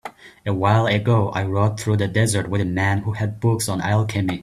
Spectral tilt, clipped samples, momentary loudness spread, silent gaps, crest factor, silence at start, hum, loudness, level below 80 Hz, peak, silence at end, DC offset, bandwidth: -6 dB/octave; under 0.1%; 5 LU; none; 18 dB; 0.05 s; none; -20 LUFS; -50 dBFS; -2 dBFS; 0 s; under 0.1%; 13.5 kHz